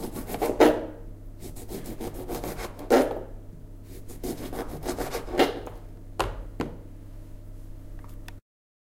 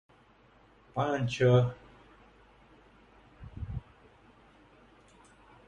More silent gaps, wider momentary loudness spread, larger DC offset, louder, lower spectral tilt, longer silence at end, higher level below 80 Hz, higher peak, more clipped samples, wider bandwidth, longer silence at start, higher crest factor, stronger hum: neither; second, 23 LU vs 26 LU; neither; about the same, -28 LUFS vs -30 LUFS; second, -5 dB/octave vs -7 dB/octave; second, 0.5 s vs 1.85 s; first, -42 dBFS vs -54 dBFS; first, -2 dBFS vs -12 dBFS; neither; first, 16.5 kHz vs 8.6 kHz; second, 0 s vs 0.95 s; first, 28 dB vs 22 dB; neither